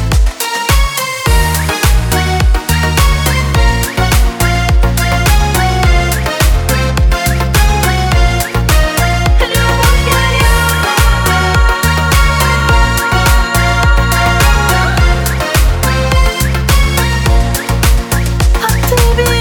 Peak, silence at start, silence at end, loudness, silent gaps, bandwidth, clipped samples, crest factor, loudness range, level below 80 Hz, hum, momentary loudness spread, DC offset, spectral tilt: 0 dBFS; 0 s; 0 s; -11 LUFS; none; over 20 kHz; under 0.1%; 10 dB; 2 LU; -12 dBFS; none; 3 LU; 0.1%; -4 dB/octave